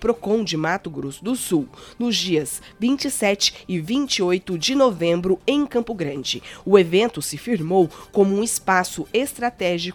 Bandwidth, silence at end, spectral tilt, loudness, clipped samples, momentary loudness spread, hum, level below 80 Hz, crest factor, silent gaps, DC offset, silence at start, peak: 18 kHz; 0 s; -4 dB/octave; -21 LUFS; under 0.1%; 8 LU; none; -52 dBFS; 22 dB; none; under 0.1%; 0 s; 0 dBFS